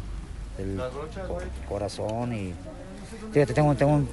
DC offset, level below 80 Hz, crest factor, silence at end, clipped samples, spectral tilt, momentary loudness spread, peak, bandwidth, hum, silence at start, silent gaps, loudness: under 0.1%; -40 dBFS; 18 dB; 0 s; under 0.1%; -7.5 dB/octave; 18 LU; -10 dBFS; 11.5 kHz; none; 0 s; none; -28 LUFS